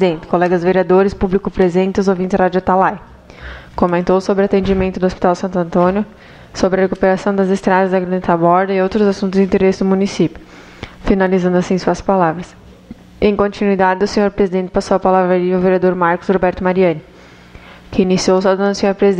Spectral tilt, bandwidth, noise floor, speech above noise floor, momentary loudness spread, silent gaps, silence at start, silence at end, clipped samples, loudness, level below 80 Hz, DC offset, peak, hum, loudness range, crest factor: -7 dB/octave; 9 kHz; -39 dBFS; 25 dB; 6 LU; none; 0 s; 0 s; under 0.1%; -15 LUFS; -36 dBFS; under 0.1%; 0 dBFS; none; 2 LU; 14 dB